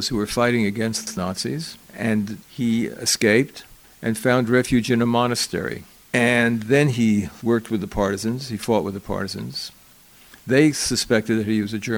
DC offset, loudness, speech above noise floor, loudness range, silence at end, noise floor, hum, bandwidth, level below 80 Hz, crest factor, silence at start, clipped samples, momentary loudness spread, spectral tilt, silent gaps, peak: under 0.1%; -21 LUFS; 29 dB; 4 LU; 0 s; -50 dBFS; none; 19.5 kHz; -46 dBFS; 18 dB; 0 s; under 0.1%; 12 LU; -4.5 dB/octave; none; -2 dBFS